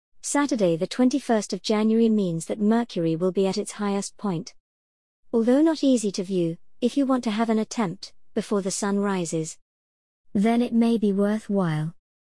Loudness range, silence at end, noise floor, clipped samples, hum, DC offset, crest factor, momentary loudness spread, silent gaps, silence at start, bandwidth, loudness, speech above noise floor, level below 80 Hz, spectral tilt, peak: 3 LU; 0.3 s; under -90 dBFS; under 0.1%; none; 0.3%; 14 dB; 9 LU; 4.60-5.23 s, 9.62-10.24 s; 0.25 s; 12 kHz; -24 LUFS; over 67 dB; -64 dBFS; -5.5 dB/octave; -8 dBFS